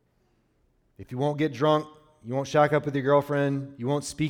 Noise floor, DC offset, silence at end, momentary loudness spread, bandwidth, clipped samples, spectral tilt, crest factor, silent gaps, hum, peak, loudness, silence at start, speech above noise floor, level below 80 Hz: -68 dBFS; under 0.1%; 0 s; 10 LU; 15 kHz; under 0.1%; -6.5 dB/octave; 18 dB; none; none; -8 dBFS; -26 LUFS; 1 s; 43 dB; -62 dBFS